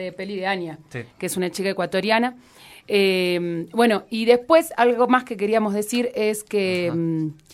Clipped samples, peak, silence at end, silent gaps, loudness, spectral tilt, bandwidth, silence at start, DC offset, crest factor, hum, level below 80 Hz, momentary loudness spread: under 0.1%; -2 dBFS; 0.2 s; none; -21 LUFS; -5 dB/octave; 16 kHz; 0 s; under 0.1%; 18 dB; none; -64 dBFS; 10 LU